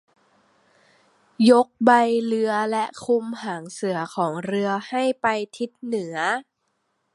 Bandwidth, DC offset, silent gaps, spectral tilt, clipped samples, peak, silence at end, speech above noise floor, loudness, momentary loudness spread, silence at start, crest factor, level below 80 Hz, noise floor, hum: 11.5 kHz; under 0.1%; none; -5 dB/octave; under 0.1%; -2 dBFS; 0.75 s; 51 dB; -22 LUFS; 12 LU; 1.4 s; 22 dB; -74 dBFS; -73 dBFS; none